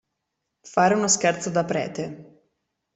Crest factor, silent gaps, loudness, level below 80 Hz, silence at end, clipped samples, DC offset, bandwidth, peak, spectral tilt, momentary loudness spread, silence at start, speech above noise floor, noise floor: 20 dB; none; -22 LUFS; -66 dBFS; 0.75 s; under 0.1%; under 0.1%; 8.4 kHz; -4 dBFS; -3.5 dB/octave; 13 LU; 0.65 s; 57 dB; -80 dBFS